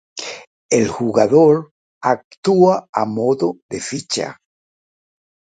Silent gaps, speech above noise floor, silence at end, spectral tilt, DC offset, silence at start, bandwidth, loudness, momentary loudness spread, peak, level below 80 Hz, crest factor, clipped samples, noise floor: 0.47-0.69 s, 1.71-2.01 s, 2.24-2.31 s, 2.37-2.43 s, 2.89-2.93 s, 3.62-3.69 s; over 74 dB; 1.25 s; -5 dB/octave; under 0.1%; 0.15 s; 9.4 kHz; -17 LUFS; 16 LU; 0 dBFS; -58 dBFS; 18 dB; under 0.1%; under -90 dBFS